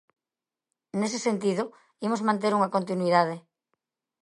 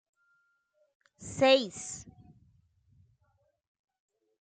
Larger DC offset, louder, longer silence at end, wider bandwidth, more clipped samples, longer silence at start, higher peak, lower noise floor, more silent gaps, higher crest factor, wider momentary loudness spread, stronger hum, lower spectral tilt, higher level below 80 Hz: neither; about the same, -27 LUFS vs -27 LUFS; second, 0.85 s vs 2.45 s; first, 11.5 kHz vs 9.4 kHz; neither; second, 0.95 s vs 1.2 s; first, -6 dBFS vs -12 dBFS; first, under -90 dBFS vs -74 dBFS; neither; about the same, 22 dB vs 24 dB; second, 11 LU vs 20 LU; neither; first, -5.5 dB/octave vs -3 dB/octave; second, -78 dBFS vs -70 dBFS